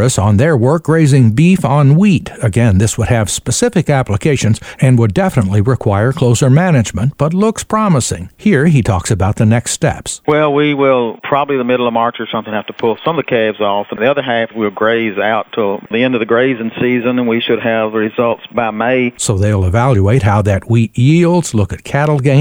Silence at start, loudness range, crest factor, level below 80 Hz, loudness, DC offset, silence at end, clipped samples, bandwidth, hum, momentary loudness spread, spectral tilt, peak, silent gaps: 0 s; 4 LU; 12 dB; -38 dBFS; -13 LUFS; under 0.1%; 0 s; under 0.1%; over 20 kHz; none; 6 LU; -6 dB/octave; 0 dBFS; none